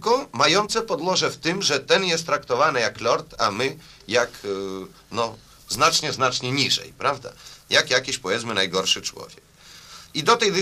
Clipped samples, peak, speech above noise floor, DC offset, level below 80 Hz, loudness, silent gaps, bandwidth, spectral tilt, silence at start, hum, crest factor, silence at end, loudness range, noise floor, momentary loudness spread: under 0.1%; -4 dBFS; 23 dB; under 0.1%; -56 dBFS; -22 LUFS; none; 15.5 kHz; -2.5 dB/octave; 0 s; none; 20 dB; 0 s; 3 LU; -46 dBFS; 13 LU